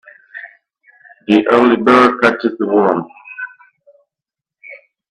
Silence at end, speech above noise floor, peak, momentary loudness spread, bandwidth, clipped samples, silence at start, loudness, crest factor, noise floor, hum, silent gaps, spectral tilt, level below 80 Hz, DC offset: 0.35 s; 74 dB; 0 dBFS; 23 LU; 10.5 kHz; under 0.1%; 0.35 s; -12 LUFS; 16 dB; -86 dBFS; none; none; -6 dB/octave; -58 dBFS; under 0.1%